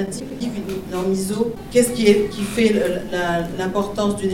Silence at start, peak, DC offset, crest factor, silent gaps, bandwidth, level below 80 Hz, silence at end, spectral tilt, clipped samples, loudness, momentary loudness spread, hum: 0 s; 0 dBFS; under 0.1%; 20 dB; none; 16.5 kHz; -42 dBFS; 0 s; -5 dB/octave; under 0.1%; -20 LUFS; 11 LU; none